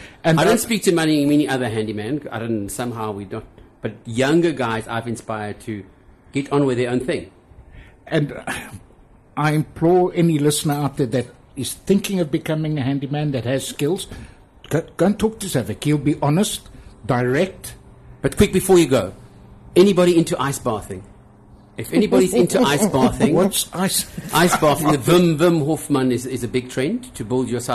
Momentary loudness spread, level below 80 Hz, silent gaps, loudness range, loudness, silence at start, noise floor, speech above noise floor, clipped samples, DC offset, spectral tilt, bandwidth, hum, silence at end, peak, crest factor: 13 LU; -44 dBFS; none; 7 LU; -19 LUFS; 0 s; -49 dBFS; 30 dB; under 0.1%; under 0.1%; -5.5 dB/octave; 13 kHz; none; 0 s; -2 dBFS; 18 dB